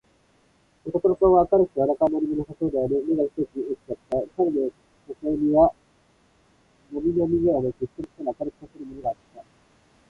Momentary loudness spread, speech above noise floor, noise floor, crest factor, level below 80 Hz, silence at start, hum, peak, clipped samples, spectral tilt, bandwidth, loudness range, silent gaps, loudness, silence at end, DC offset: 15 LU; 39 dB; -62 dBFS; 18 dB; -50 dBFS; 0.85 s; none; -6 dBFS; under 0.1%; -10.5 dB/octave; 4.5 kHz; 5 LU; none; -24 LUFS; 0.7 s; under 0.1%